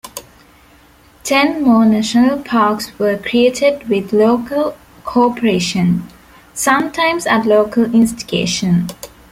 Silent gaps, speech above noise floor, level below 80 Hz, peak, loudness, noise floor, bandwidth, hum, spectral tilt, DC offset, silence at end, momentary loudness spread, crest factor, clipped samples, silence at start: none; 33 dB; -48 dBFS; -2 dBFS; -14 LUFS; -46 dBFS; 16 kHz; none; -5 dB/octave; under 0.1%; 0.25 s; 9 LU; 14 dB; under 0.1%; 0.05 s